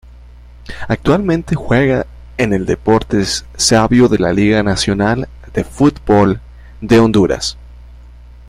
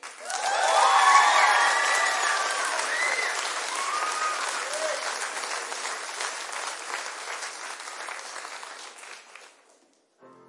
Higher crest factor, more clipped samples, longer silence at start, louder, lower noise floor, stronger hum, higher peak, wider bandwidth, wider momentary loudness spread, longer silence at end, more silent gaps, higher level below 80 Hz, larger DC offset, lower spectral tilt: second, 14 dB vs 22 dB; neither; first, 0.45 s vs 0.05 s; first, -14 LUFS vs -24 LUFS; second, -37 dBFS vs -63 dBFS; first, 60 Hz at -35 dBFS vs none; first, 0 dBFS vs -4 dBFS; first, 15 kHz vs 11.5 kHz; second, 11 LU vs 18 LU; second, 0.05 s vs 0.2 s; neither; first, -32 dBFS vs under -90 dBFS; neither; first, -5 dB/octave vs 3 dB/octave